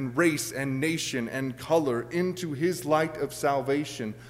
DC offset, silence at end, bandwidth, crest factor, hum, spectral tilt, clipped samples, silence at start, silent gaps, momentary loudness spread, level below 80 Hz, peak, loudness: under 0.1%; 0 s; 16 kHz; 18 dB; none; -5 dB/octave; under 0.1%; 0 s; none; 5 LU; -62 dBFS; -10 dBFS; -28 LUFS